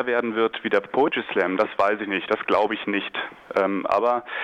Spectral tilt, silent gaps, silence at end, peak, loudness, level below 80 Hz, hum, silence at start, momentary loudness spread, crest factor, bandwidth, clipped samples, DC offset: -6 dB/octave; none; 0 s; -10 dBFS; -23 LUFS; -64 dBFS; none; 0 s; 4 LU; 14 dB; 8.6 kHz; under 0.1%; under 0.1%